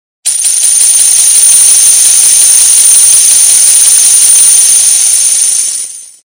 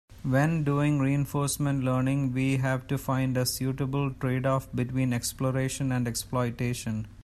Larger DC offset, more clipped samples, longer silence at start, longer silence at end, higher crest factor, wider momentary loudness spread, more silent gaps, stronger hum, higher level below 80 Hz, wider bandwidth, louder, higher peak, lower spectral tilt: neither; first, 10% vs under 0.1%; first, 0.25 s vs 0.1 s; first, 0.2 s vs 0.05 s; second, 6 dB vs 14 dB; about the same, 6 LU vs 4 LU; neither; neither; about the same, -54 dBFS vs -50 dBFS; first, over 20 kHz vs 14 kHz; first, -1 LUFS vs -28 LUFS; first, 0 dBFS vs -12 dBFS; second, 4 dB/octave vs -6 dB/octave